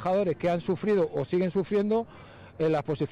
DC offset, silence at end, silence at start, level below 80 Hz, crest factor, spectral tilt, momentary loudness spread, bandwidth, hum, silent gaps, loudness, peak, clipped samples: under 0.1%; 0 s; 0 s; -60 dBFS; 10 dB; -8.5 dB/octave; 4 LU; 8.2 kHz; none; none; -27 LUFS; -18 dBFS; under 0.1%